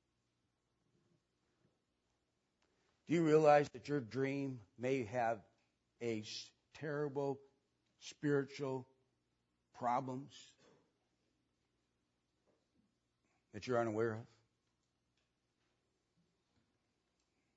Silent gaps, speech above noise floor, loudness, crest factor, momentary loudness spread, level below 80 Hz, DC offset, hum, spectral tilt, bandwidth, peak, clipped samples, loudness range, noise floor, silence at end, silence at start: none; 47 dB; -38 LUFS; 24 dB; 18 LU; -86 dBFS; under 0.1%; 60 Hz at -75 dBFS; -5.5 dB/octave; 7.6 kHz; -18 dBFS; under 0.1%; 11 LU; -85 dBFS; 3.3 s; 3.1 s